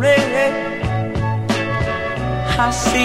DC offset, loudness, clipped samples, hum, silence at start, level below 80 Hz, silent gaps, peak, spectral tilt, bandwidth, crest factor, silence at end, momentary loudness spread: 0.6%; -19 LUFS; under 0.1%; none; 0 s; -34 dBFS; none; -2 dBFS; -5 dB/octave; 16 kHz; 16 dB; 0 s; 7 LU